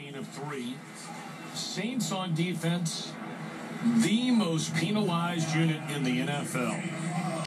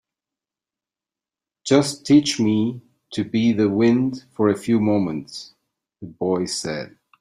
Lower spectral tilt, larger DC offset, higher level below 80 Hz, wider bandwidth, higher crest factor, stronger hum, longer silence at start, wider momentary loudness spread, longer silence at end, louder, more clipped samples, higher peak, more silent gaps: about the same, -5 dB/octave vs -5.5 dB/octave; neither; second, -82 dBFS vs -60 dBFS; first, 14 kHz vs 12.5 kHz; second, 14 dB vs 20 dB; neither; second, 0 s vs 1.65 s; second, 13 LU vs 18 LU; second, 0 s vs 0.3 s; second, -30 LUFS vs -20 LUFS; neither; second, -16 dBFS vs -2 dBFS; neither